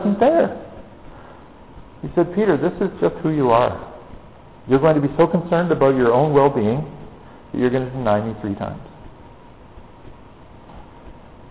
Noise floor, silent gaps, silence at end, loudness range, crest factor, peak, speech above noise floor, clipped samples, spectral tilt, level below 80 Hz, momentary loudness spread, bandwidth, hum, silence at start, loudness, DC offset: -43 dBFS; none; 0.4 s; 8 LU; 16 dB; -4 dBFS; 26 dB; under 0.1%; -11.5 dB/octave; -46 dBFS; 19 LU; 4 kHz; none; 0 s; -19 LUFS; 0.3%